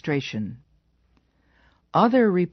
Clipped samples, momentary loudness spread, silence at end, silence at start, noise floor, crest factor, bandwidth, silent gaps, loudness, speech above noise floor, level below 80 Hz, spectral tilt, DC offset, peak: under 0.1%; 14 LU; 0.05 s; 0.05 s; -64 dBFS; 18 dB; 6.4 kHz; none; -22 LUFS; 43 dB; -62 dBFS; -5.5 dB/octave; under 0.1%; -6 dBFS